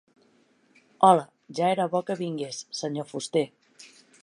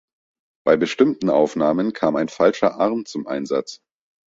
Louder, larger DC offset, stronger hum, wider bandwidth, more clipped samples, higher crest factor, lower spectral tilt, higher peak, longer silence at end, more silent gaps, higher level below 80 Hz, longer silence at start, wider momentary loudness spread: second, -26 LUFS vs -20 LUFS; neither; neither; first, 11.5 kHz vs 7.8 kHz; neither; first, 24 dB vs 18 dB; about the same, -5 dB/octave vs -6 dB/octave; about the same, -4 dBFS vs -2 dBFS; first, 0.75 s vs 0.55 s; neither; second, -80 dBFS vs -62 dBFS; first, 1 s vs 0.65 s; first, 14 LU vs 9 LU